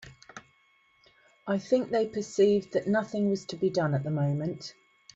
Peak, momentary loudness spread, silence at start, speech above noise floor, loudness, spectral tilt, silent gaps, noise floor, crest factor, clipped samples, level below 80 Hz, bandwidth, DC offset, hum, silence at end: -12 dBFS; 20 LU; 0 s; 38 dB; -28 LUFS; -7 dB/octave; none; -66 dBFS; 18 dB; under 0.1%; -68 dBFS; 8 kHz; under 0.1%; none; 0.45 s